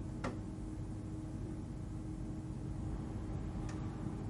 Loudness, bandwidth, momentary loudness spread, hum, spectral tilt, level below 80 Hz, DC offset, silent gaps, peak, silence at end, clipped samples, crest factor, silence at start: -44 LUFS; 11.5 kHz; 3 LU; none; -7.5 dB/octave; -48 dBFS; under 0.1%; none; -26 dBFS; 0 s; under 0.1%; 16 dB; 0 s